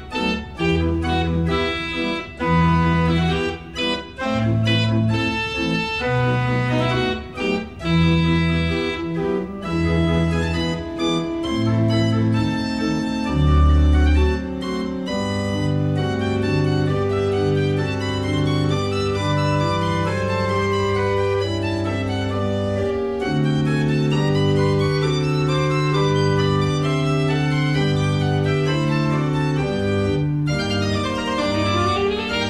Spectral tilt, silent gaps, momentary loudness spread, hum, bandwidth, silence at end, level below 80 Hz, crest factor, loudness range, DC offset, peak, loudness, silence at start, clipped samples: -6.5 dB/octave; none; 5 LU; none; 11 kHz; 0 s; -32 dBFS; 12 dB; 2 LU; 0.3%; -6 dBFS; -20 LUFS; 0 s; under 0.1%